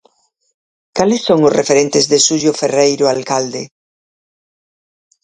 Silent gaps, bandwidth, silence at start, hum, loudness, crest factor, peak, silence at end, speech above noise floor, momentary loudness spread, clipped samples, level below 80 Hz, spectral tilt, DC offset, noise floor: none; 9.8 kHz; 0.95 s; none; -13 LUFS; 16 dB; 0 dBFS; 1.6 s; 44 dB; 12 LU; under 0.1%; -56 dBFS; -3.5 dB/octave; under 0.1%; -56 dBFS